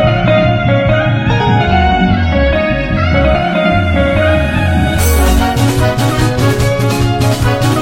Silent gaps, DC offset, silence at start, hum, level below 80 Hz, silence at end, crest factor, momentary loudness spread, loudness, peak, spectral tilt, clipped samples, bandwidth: none; under 0.1%; 0 s; none; -20 dBFS; 0 s; 10 dB; 2 LU; -12 LUFS; 0 dBFS; -6 dB/octave; under 0.1%; 16.5 kHz